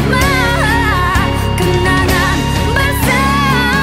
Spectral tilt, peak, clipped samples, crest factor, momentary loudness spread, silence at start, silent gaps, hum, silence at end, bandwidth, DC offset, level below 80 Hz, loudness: -5 dB/octave; 0 dBFS; under 0.1%; 12 dB; 2 LU; 0 s; none; none; 0 s; 16.5 kHz; under 0.1%; -20 dBFS; -12 LUFS